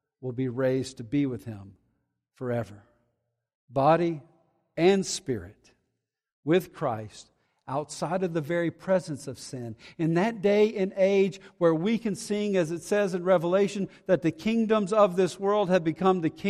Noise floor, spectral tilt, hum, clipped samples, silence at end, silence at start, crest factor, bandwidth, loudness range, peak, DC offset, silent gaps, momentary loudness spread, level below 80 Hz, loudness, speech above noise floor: -81 dBFS; -6 dB/octave; none; under 0.1%; 0 s; 0.2 s; 20 dB; 14 kHz; 7 LU; -8 dBFS; under 0.1%; 3.55-3.68 s, 6.33-6.43 s; 14 LU; -66 dBFS; -27 LUFS; 55 dB